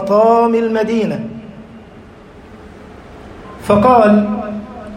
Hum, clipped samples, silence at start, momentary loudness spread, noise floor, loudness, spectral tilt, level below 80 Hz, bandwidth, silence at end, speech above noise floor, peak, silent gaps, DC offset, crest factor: none; under 0.1%; 0 s; 25 LU; -38 dBFS; -13 LUFS; -7.5 dB/octave; -44 dBFS; 11 kHz; 0 s; 26 dB; 0 dBFS; none; under 0.1%; 14 dB